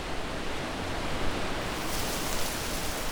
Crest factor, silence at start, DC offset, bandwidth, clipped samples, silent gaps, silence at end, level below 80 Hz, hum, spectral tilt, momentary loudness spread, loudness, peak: 16 dB; 0 s; under 0.1%; over 20 kHz; under 0.1%; none; 0 s; -38 dBFS; none; -3 dB/octave; 4 LU; -32 LUFS; -14 dBFS